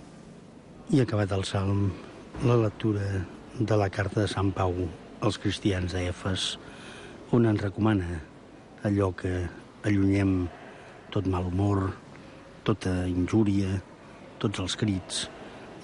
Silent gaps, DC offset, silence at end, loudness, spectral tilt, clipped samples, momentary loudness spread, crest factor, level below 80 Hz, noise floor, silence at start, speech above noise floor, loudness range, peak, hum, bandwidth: none; under 0.1%; 0 s; -28 LUFS; -6.5 dB/octave; under 0.1%; 19 LU; 16 dB; -44 dBFS; -49 dBFS; 0 s; 22 dB; 2 LU; -12 dBFS; none; 11 kHz